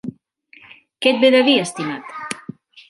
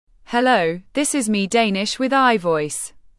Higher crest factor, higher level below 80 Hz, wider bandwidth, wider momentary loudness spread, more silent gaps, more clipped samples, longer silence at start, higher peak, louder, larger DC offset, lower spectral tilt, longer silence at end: about the same, 18 dB vs 16 dB; second, -68 dBFS vs -56 dBFS; about the same, 11.5 kHz vs 12 kHz; first, 19 LU vs 7 LU; neither; neither; second, 0.05 s vs 0.3 s; about the same, -2 dBFS vs -4 dBFS; about the same, -17 LUFS vs -19 LUFS; neither; about the same, -4 dB/octave vs -3.5 dB/octave; first, 0.5 s vs 0.3 s